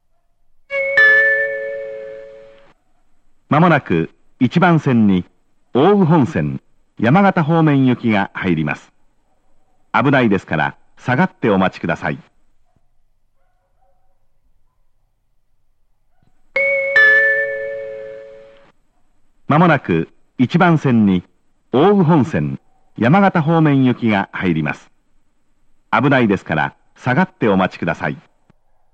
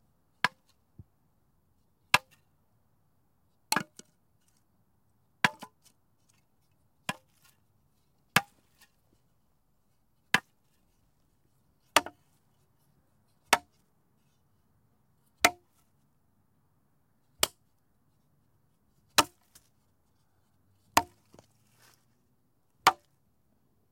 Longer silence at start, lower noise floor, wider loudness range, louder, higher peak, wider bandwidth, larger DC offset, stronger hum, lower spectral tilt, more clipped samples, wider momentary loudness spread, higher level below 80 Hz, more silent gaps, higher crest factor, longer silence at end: first, 0.7 s vs 0.45 s; second, -59 dBFS vs -74 dBFS; about the same, 5 LU vs 5 LU; first, -15 LUFS vs -29 LUFS; first, 0 dBFS vs -6 dBFS; second, 8 kHz vs 16.5 kHz; neither; neither; first, -8 dB/octave vs -1.5 dB/octave; neither; about the same, 15 LU vs 13 LU; first, -52 dBFS vs -70 dBFS; neither; second, 16 dB vs 32 dB; second, 0.75 s vs 1 s